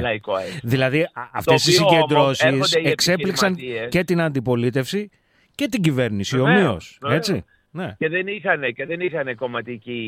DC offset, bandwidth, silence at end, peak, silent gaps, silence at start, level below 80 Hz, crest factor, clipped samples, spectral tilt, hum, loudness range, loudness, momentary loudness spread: under 0.1%; 16.5 kHz; 0 s; -2 dBFS; none; 0 s; -54 dBFS; 18 dB; under 0.1%; -4.5 dB/octave; none; 4 LU; -20 LUFS; 12 LU